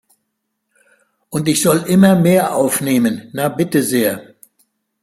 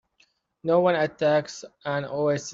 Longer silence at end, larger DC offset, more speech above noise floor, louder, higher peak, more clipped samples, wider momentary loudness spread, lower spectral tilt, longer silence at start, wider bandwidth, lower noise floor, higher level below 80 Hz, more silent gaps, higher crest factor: first, 0.8 s vs 0 s; neither; first, 59 dB vs 42 dB; first, -15 LUFS vs -24 LUFS; first, -2 dBFS vs -8 dBFS; neither; second, 10 LU vs 13 LU; about the same, -5 dB/octave vs -5.5 dB/octave; first, 1.3 s vs 0.65 s; first, 16 kHz vs 7.8 kHz; first, -73 dBFS vs -66 dBFS; first, -56 dBFS vs -66 dBFS; neither; about the same, 16 dB vs 16 dB